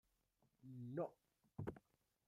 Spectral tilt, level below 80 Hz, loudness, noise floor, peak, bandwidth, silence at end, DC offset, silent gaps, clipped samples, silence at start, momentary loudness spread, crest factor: -9.5 dB/octave; -78 dBFS; -52 LUFS; -83 dBFS; -34 dBFS; 14.5 kHz; 0.5 s; under 0.1%; none; under 0.1%; 0.65 s; 16 LU; 20 dB